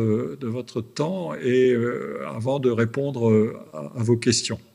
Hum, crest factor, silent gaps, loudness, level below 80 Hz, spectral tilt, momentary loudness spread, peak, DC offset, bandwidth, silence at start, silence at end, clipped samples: none; 16 dB; none; -23 LUFS; -68 dBFS; -5.5 dB/octave; 10 LU; -6 dBFS; under 0.1%; 11.5 kHz; 0 s; 0.15 s; under 0.1%